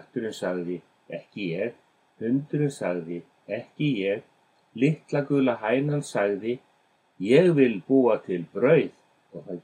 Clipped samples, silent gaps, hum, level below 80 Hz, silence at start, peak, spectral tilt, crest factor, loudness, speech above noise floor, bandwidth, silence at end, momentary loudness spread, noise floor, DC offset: under 0.1%; none; none; -78 dBFS; 0.15 s; -6 dBFS; -7 dB/octave; 20 dB; -25 LUFS; 41 dB; 11 kHz; 0.05 s; 16 LU; -65 dBFS; under 0.1%